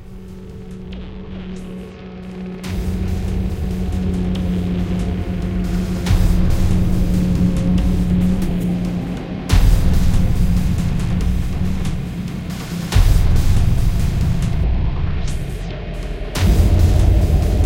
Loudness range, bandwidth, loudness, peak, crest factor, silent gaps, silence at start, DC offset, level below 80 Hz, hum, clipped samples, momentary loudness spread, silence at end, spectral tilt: 6 LU; 16.5 kHz; -19 LUFS; -2 dBFS; 16 dB; none; 0 s; under 0.1%; -20 dBFS; none; under 0.1%; 15 LU; 0 s; -7 dB/octave